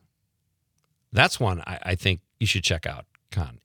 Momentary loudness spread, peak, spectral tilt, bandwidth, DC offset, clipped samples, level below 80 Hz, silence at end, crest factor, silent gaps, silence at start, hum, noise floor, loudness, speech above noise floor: 13 LU; -2 dBFS; -4 dB/octave; 19 kHz; under 0.1%; under 0.1%; -48 dBFS; 0.1 s; 26 dB; none; 1.1 s; none; -75 dBFS; -25 LUFS; 50 dB